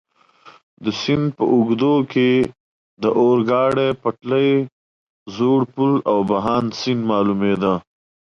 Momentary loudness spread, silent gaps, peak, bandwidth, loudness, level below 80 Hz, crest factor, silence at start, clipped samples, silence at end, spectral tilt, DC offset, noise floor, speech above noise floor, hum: 7 LU; 0.63-0.77 s, 2.60-2.97 s, 4.72-5.26 s; -6 dBFS; 7.4 kHz; -18 LUFS; -56 dBFS; 14 dB; 0.45 s; under 0.1%; 0.5 s; -7 dB/octave; under 0.1%; -49 dBFS; 31 dB; none